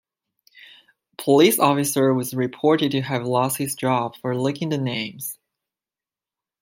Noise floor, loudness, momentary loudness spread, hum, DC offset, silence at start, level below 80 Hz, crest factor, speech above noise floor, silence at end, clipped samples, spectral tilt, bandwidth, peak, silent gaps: under -90 dBFS; -21 LUFS; 12 LU; none; under 0.1%; 1.2 s; -68 dBFS; 20 dB; over 69 dB; 1.25 s; under 0.1%; -5 dB/octave; 16.5 kHz; -2 dBFS; none